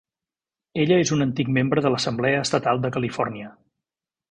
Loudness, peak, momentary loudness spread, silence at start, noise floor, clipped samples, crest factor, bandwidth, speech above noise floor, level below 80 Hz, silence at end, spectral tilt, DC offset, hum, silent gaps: -22 LUFS; -6 dBFS; 9 LU; 0.75 s; under -90 dBFS; under 0.1%; 18 dB; 10.5 kHz; over 68 dB; -58 dBFS; 0.8 s; -5.5 dB/octave; under 0.1%; none; none